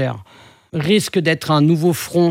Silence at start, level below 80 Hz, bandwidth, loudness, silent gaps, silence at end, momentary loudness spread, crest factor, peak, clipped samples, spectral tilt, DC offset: 0 s; -60 dBFS; 16.5 kHz; -17 LUFS; none; 0 s; 10 LU; 14 dB; -2 dBFS; under 0.1%; -5.5 dB/octave; under 0.1%